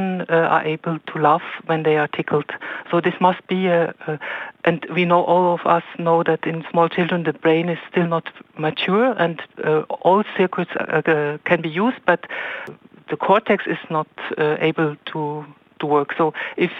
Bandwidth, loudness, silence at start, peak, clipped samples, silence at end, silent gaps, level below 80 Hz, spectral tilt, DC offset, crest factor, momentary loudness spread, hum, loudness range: 5.8 kHz; -20 LUFS; 0 s; -2 dBFS; under 0.1%; 0 s; none; -68 dBFS; -8.5 dB/octave; under 0.1%; 18 dB; 10 LU; none; 3 LU